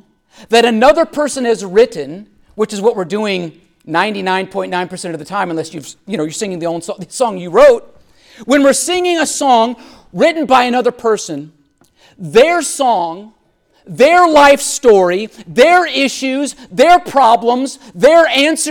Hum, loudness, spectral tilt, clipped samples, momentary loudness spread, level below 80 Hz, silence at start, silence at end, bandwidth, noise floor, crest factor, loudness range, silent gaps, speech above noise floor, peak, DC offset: none; -12 LUFS; -3.5 dB/octave; under 0.1%; 15 LU; -48 dBFS; 0.4 s; 0 s; 18 kHz; -51 dBFS; 12 dB; 8 LU; none; 39 dB; 0 dBFS; under 0.1%